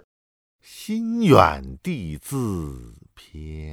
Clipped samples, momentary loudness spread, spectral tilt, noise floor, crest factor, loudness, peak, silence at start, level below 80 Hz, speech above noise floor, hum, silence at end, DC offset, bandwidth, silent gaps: under 0.1%; 23 LU; -6.5 dB/octave; under -90 dBFS; 24 dB; -21 LUFS; 0 dBFS; 0.7 s; -42 dBFS; over 67 dB; none; 0 s; under 0.1%; 18 kHz; none